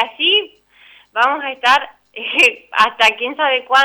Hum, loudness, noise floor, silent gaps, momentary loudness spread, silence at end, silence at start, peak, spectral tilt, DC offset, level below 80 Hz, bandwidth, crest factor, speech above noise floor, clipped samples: 50 Hz at -70 dBFS; -14 LUFS; -47 dBFS; none; 13 LU; 0 s; 0 s; -2 dBFS; 0 dB/octave; under 0.1%; -60 dBFS; over 20 kHz; 14 dB; 32 dB; under 0.1%